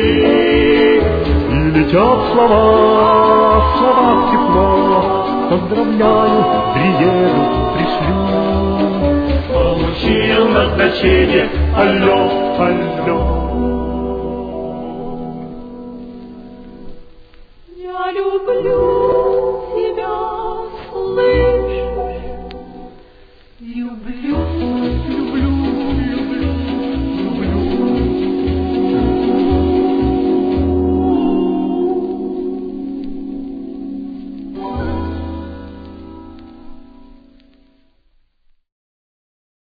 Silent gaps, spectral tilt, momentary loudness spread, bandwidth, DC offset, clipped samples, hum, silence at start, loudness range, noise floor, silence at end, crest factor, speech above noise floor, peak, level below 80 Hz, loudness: none; -9.5 dB/octave; 16 LU; 5 kHz; under 0.1%; under 0.1%; none; 0 s; 15 LU; -56 dBFS; 2.65 s; 16 dB; 44 dB; 0 dBFS; -26 dBFS; -15 LUFS